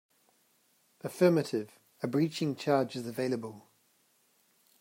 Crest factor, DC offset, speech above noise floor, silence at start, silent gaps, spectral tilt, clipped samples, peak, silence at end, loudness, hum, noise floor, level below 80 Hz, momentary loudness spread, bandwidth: 20 dB; under 0.1%; 40 dB; 1.05 s; none; -6.5 dB/octave; under 0.1%; -14 dBFS; 1.2 s; -31 LUFS; none; -70 dBFS; -80 dBFS; 17 LU; 16 kHz